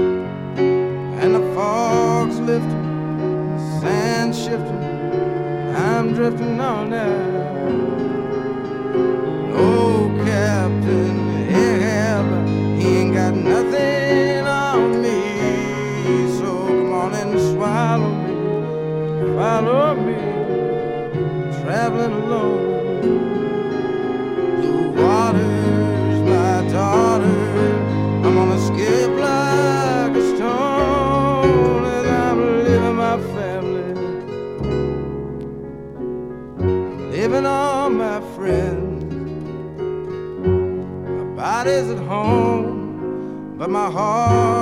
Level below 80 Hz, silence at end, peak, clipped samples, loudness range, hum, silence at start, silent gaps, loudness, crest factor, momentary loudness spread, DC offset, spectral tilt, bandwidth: -42 dBFS; 0 s; -4 dBFS; under 0.1%; 5 LU; none; 0 s; none; -19 LUFS; 16 dB; 9 LU; under 0.1%; -7 dB/octave; 13 kHz